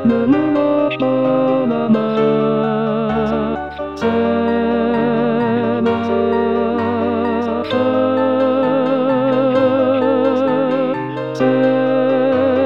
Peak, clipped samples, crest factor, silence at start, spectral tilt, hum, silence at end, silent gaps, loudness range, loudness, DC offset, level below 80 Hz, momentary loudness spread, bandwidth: -4 dBFS; under 0.1%; 12 dB; 0 s; -8 dB/octave; none; 0 s; none; 2 LU; -16 LUFS; 0.4%; -50 dBFS; 4 LU; 6.8 kHz